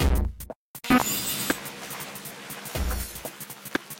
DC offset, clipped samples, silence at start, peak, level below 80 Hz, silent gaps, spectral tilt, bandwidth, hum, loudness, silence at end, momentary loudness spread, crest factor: under 0.1%; under 0.1%; 0 s; -8 dBFS; -34 dBFS; 0.56-0.74 s; -4 dB/octave; 17 kHz; none; -29 LUFS; 0 s; 15 LU; 20 dB